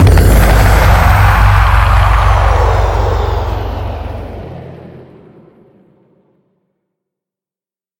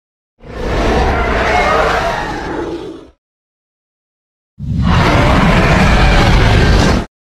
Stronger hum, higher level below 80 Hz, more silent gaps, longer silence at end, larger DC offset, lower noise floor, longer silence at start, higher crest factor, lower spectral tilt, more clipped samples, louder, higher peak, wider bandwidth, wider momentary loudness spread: neither; about the same, -14 dBFS vs -18 dBFS; second, none vs 3.18-4.57 s; first, 3 s vs 0.25 s; neither; about the same, under -90 dBFS vs under -90 dBFS; second, 0 s vs 0.45 s; about the same, 10 dB vs 12 dB; about the same, -6 dB/octave vs -6 dB/octave; first, 0.4% vs under 0.1%; about the same, -10 LUFS vs -12 LUFS; about the same, 0 dBFS vs 0 dBFS; first, 17 kHz vs 13 kHz; first, 17 LU vs 13 LU